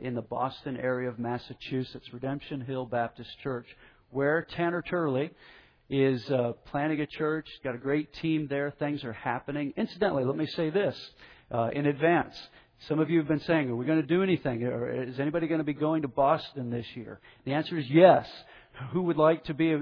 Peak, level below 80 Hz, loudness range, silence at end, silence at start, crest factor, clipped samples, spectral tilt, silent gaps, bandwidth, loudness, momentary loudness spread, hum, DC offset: -6 dBFS; -62 dBFS; 6 LU; 0 s; 0 s; 22 dB; under 0.1%; -9 dB/octave; none; 5.4 kHz; -29 LUFS; 11 LU; none; under 0.1%